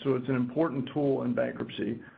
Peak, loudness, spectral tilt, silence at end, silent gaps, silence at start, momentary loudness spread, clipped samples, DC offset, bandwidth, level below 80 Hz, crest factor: -14 dBFS; -30 LUFS; -10 dB/octave; 0.05 s; none; 0 s; 6 LU; under 0.1%; under 0.1%; 4.7 kHz; -66 dBFS; 16 dB